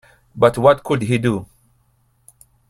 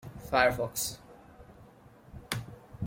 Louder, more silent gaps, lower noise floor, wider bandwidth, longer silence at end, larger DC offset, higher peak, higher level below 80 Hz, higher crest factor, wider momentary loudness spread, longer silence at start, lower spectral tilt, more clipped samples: first, -17 LUFS vs -30 LUFS; neither; first, -61 dBFS vs -56 dBFS; second, 13.5 kHz vs 16.5 kHz; first, 1.25 s vs 0 s; neither; first, 0 dBFS vs -8 dBFS; about the same, -50 dBFS vs -54 dBFS; second, 20 dB vs 26 dB; second, 8 LU vs 24 LU; first, 0.35 s vs 0.05 s; first, -7 dB/octave vs -3.5 dB/octave; neither